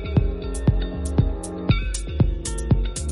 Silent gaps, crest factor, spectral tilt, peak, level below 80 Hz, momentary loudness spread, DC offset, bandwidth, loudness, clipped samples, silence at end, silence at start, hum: none; 16 dB; -6 dB/octave; -6 dBFS; -26 dBFS; 5 LU; under 0.1%; 11.5 kHz; -24 LUFS; under 0.1%; 0 s; 0 s; none